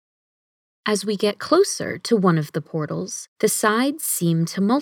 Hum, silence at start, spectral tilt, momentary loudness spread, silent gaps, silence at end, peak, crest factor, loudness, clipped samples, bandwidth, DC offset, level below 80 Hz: none; 0.85 s; -4.5 dB/octave; 9 LU; 3.28-3.36 s; 0 s; -4 dBFS; 18 dB; -21 LUFS; under 0.1%; 19 kHz; under 0.1%; -74 dBFS